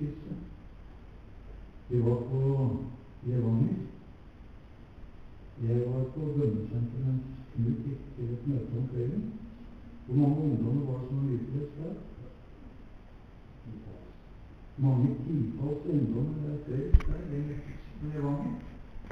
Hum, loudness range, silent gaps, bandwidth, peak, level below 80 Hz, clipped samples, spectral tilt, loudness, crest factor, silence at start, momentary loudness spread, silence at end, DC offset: none; 4 LU; none; 4.8 kHz; -8 dBFS; -40 dBFS; under 0.1%; -11 dB/octave; -32 LUFS; 24 dB; 0 s; 23 LU; 0 s; under 0.1%